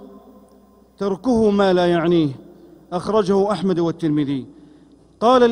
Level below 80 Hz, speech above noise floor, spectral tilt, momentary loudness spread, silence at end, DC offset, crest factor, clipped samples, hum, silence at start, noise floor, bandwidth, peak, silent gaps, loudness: -50 dBFS; 34 dB; -7 dB/octave; 11 LU; 0 s; under 0.1%; 16 dB; under 0.1%; none; 0 s; -51 dBFS; 10.5 kHz; -4 dBFS; none; -19 LUFS